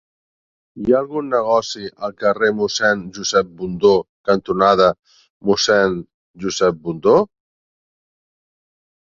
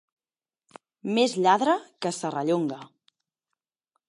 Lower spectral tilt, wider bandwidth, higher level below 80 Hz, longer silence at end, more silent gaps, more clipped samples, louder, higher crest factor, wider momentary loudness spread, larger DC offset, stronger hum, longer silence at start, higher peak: about the same, -4 dB/octave vs -4.5 dB/octave; second, 7.6 kHz vs 11.5 kHz; first, -52 dBFS vs -82 dBFS; first, 1.75 s vs 1.25 s; first, 4.09-4.24 s, 4.99-5.03 s, 5.30-5.40 s, 6.14-6.34 s vs none; neither; first, -18 LUFS vs -25 LUFS; about the same, 18 dB vs 22 dB; about the same, 11 LU vs 11 LU; neither; neither; second, 0.75 s vs 1.05 s; first, -2 dBFS vs -6 dBFS